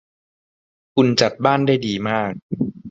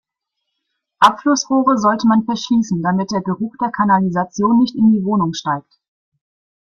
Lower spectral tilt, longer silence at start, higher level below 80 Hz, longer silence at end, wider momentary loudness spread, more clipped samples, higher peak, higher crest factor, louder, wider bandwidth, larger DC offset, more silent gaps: about the same, -5.5 dB/octave vs -5.5 dB/octave; about the same, 0.95 s vs 1 s; about the same, -56 dBFS vs -56 dBFS; second, 0 s vs 1.2 s; about the same, 9 LU vs 8 LU; neither; about the same, 0 dBFS vs 0 dBFS; about the same, 20 dB vs 18 dB; second, -19 LUFS vs -16 LUFS; about the same, 8 kHz vs 8.2 kHz; neither; first, 2.42-2.49 s vs none